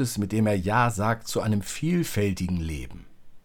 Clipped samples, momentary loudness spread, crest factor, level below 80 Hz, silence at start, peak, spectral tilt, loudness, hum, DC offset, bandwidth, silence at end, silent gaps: under 0.1%; 8 LU; 18 dB; -46 dBFS; 0 s; -8 dBFS; -5.5 dB/octave; -26 LUFS; none; under 0.1%; 19 kHz; 0.05 s; none